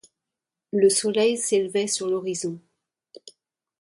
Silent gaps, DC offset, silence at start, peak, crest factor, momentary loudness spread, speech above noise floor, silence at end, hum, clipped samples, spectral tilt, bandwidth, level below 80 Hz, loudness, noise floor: none; under 0.1%; 0.75 s; -8 dBFS; 18 dB; 11 LU; 64 dB; 0.5 s; none; under 0.1%; -3 dB/octave; 11.5 kHz; -74 dBFS; -23 LUFS; -87 dBFS